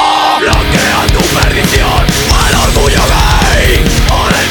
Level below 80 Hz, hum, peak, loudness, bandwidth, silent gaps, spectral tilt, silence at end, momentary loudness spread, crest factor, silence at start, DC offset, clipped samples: -12 dBFS; none; 0 dBFS; -9 LUFS; 19.5 kHz; none; -3.5 dB/octave; 0 s; 1 LU; 8 dB; 0 s; 0.3%; 0.4%